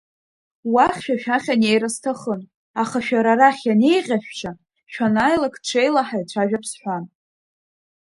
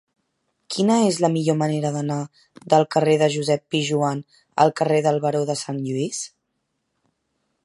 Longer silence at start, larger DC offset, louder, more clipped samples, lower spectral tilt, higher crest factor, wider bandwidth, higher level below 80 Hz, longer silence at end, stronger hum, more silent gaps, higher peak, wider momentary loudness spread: about the same, 0.65 s vs 0.7 s; neither; about the same, -20 LUFS vs -21 LUFS; neither; about the same, -4.5 dB/octave vs -5.5 dB/octave; about the same, 20 dB vs 20 dB; about the same, 11.5 kHz vs 11.5 kHz; first, -60 dBFS vs -70 dBFS; second, 1.15 s vs 1.35 s; neither; first, 2.55-2.74 s vs none; about the same, 0 dBFS vs -2 dBFS; first, 15 LU vs 12 LU